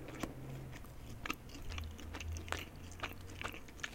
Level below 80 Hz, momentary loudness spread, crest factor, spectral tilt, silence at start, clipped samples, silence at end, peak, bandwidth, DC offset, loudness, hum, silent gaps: -52 dBFS; 6 LU; 30 dB; -4 dB/octave; 0 s; under 0.1%; 0 s; -16 dBFS; 17 kHz; under 0.1%; -46 LUFS; none; none